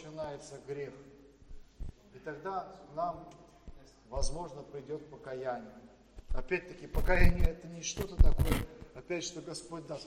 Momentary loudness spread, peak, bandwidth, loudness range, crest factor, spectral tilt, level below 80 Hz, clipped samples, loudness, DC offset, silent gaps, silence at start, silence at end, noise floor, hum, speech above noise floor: 23 LU; -10 dBFS; 15.5 kHz; 10 LU; 24 dB; -5 dB/octave; -34 dBFS; under 0.1%; -37 LUFS; under 0.1%; none; 0 s; 0 s; -53 dBFS; none; 21 dB